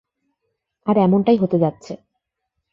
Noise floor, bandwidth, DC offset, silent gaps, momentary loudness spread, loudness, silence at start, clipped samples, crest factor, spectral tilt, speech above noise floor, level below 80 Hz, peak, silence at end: -78 dBFS; 7.4 kHz; under 0.1%; none; 21 LU; -18 LUFS; 0.85 s; under 0.1%; 16 dB; -9 dB/octave; 61 dB; -60 dBFS; -4 dBFS; 0.8 s